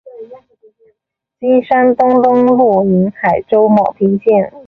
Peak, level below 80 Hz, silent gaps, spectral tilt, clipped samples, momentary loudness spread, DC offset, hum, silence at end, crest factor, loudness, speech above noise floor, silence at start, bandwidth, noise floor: -2 dBFS; -52 dBFS; none; -10 dB/octave; under 0.1%; 4 LU; under 0.1%; none; 0.05 s; 12 dB; -11 LUFS; 62 dB; 0.15 s; 4.8 kHz; -73 dBFS